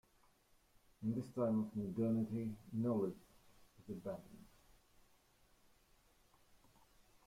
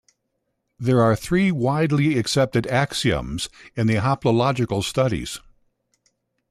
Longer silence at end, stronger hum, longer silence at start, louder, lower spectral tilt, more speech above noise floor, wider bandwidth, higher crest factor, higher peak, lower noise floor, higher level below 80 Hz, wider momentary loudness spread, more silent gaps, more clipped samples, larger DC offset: first, 2.8 s vs 1.1 s; neither; first, 1 s vs 0.8 s; second, -41 LUFS vs -21 LUFS; first, -9.5 dB/octave vs -6 dB/octave; second, 32 dB vs 55 dB; first, 15.5 kHz vs 14 kHz; about the same, 16 dB vs 16 dB; second, -28 dBFS vs -6 dBFS; about the same, -73 dBFS vs -75 dBFS; second, -72 dBFS vs -46 dBFS; first, 14 LU vs 10 LU; neither; neither; neither